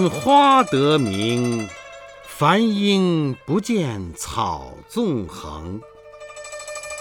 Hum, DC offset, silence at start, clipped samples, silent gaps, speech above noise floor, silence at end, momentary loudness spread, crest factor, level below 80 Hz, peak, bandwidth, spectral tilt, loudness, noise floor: 50 Hz at -45 dBFS; under 0.1%; 0 s; under 0.1%; none; 21 dB; 0 s; 20 LU; 16 dB; -48 dBFS; -4 dBFS; 19 kHz; -5.5 dB/octave; -19 LUFS; -40 dBFS